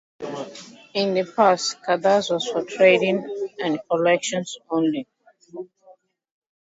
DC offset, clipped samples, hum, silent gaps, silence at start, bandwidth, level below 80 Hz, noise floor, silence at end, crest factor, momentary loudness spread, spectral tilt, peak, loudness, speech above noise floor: under 0.1%; under 0.1%; none; none; 0.2 s; 8 kHz; -70 dBFS; -54 dBFS; 1.05 s; 20 dB; 20 LU; -4 dB/octave; -4 dBFS; -21 LUFS; 33 dB